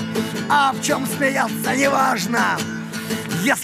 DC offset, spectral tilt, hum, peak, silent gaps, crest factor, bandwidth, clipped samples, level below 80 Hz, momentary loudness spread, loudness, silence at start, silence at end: under 0.1%; -3.5 dB/octave; none; -4 dBFS; none; 16 dB; 15.5 kHz; under 0.1%; -62 dBFS; 9 LU; -20 LUFS; 0 s; 0 s